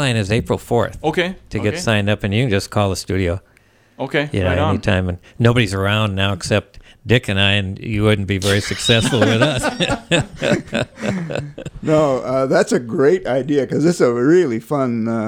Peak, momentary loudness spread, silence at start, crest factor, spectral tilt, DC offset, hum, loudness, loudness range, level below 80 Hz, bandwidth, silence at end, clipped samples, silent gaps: 0 dBFS; 8 LU; 0 s; 16 dB; -5.5 dB/octave; under 0.1%; none; -18 LUFS; 3 LU; -42 dBFS; 16 kHz; 0 s; under 0.1%; none